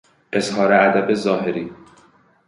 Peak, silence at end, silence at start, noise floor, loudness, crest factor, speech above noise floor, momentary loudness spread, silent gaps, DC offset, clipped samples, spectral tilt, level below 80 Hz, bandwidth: -2 dBFS; 0.75 s; 0.3 s; -54 dBFS; -18 LUFS; 18 dB; 36 dB; 12 LU; none; under 0.1%; under 0.1%; -5.5 dB/octave; -62 dBFS; 11.5 kHz